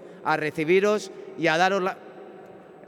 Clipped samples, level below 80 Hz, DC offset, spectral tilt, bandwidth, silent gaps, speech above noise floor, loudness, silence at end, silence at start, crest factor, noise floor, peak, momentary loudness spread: under 0.1%; -76 dBFS; under 0.1%; -5 dB/octave; 14.5 kHz; none; 22 dB; -24 LUFS; 0.05 s; 0 s; 18 dB; -46 dBFS; -8 dBFS; 22 LU